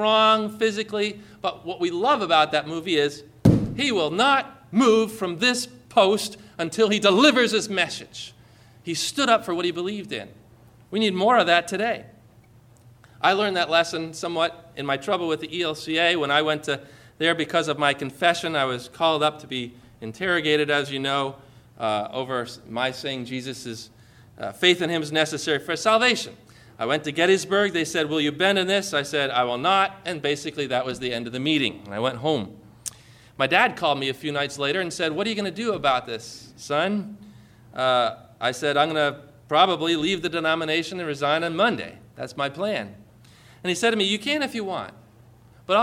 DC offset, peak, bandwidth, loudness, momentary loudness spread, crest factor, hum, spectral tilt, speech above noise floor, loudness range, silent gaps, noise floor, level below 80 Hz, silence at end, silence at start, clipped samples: under 0.1%; -4 dBFS; 16 kHz; -23 LUFS; 13 LU; 20 dB; none; -4 dB/octave; 29 dB; 5 LU; none; -53 dBFS; -54 dBFS; 0 s; 0 s; under 0.1%